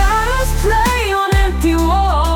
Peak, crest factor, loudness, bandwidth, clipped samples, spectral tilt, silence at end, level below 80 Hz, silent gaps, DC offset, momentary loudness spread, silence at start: -2 dBFS; 10 dB; -15 LUFS; 18.5 kHz; under 0.1%; -5 dB/octave; 0 s; -16 dBFS; none; under 0.1%; 2 LU; 0 s